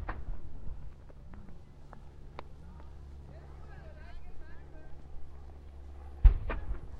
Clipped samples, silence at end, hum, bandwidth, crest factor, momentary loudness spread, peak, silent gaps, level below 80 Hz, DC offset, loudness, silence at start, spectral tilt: under 0.1%; 0 s; none; 4.3 kHz; 26 dB; 22 LU; -8 dBFS; none; -34 dBFS; under 0.1%; -36 LUFS; 0 s; -8.5 dB/octave